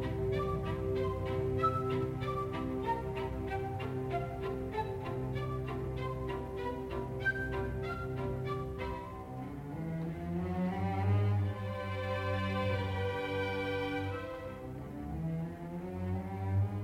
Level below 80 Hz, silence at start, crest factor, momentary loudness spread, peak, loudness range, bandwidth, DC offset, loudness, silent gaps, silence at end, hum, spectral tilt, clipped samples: -50 dBFS; 0 s; 16 dB; 8 LU; -20 dBFS; 4 LU; 13.5 kHz; under 0.1%; -36 LUFS; none; 0 s; none; -8 dB/octave; under 0.1%